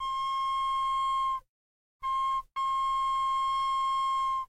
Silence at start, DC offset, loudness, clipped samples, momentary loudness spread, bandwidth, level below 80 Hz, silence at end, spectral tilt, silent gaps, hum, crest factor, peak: 0 s; under 0.1%; -29 LUFS; under 0.1%; 4 LU; 10.5 kHz; -56 dBFS; 0.05 s; 1 dB/octave; 1.49-2.00 s; none; 6 dB; -24 dBFS